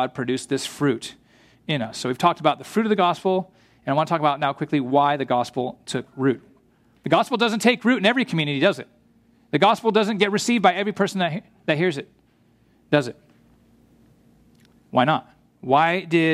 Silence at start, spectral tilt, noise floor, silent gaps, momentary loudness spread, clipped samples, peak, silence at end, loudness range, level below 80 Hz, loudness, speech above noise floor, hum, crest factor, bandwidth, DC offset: 0 s; -5 dB/octave; -59 dBFS; none; 11 LU; under 0.1%; -2 dBFS; 0 s; 6 LU; -66 dBFS; -22 LUFS; 38 dB; none; 20 dB; 14.5 kHz; under 0.1%